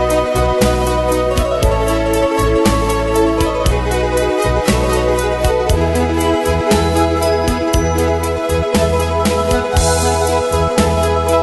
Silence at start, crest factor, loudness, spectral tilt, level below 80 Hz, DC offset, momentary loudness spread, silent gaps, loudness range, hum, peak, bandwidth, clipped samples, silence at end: 0 s; 14 dB; -15 LUFS; -5 dB/octave; -22 dBFS; under 0.1%; 2 LU; none; 0 LU; none; 0 dBFS; 12.5 kHz; under 0.1%; 0 s